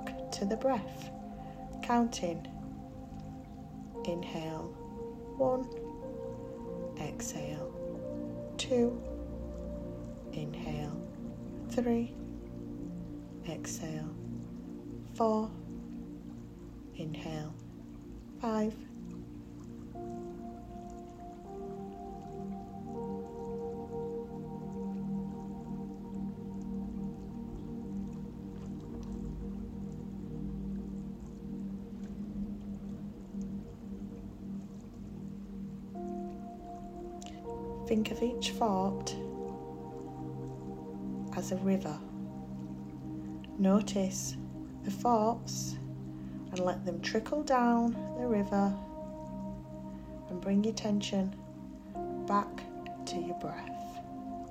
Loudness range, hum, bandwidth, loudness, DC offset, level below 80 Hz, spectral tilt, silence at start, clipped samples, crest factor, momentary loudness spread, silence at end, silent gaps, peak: 10 LU; none; 16 kHz; -38 LUFS; under 0.1%; -54 dBFS; -6 dB/octave; 0 s; under 0.1%; 20 dB; 14 LU; 0 s; none; -16 dBFS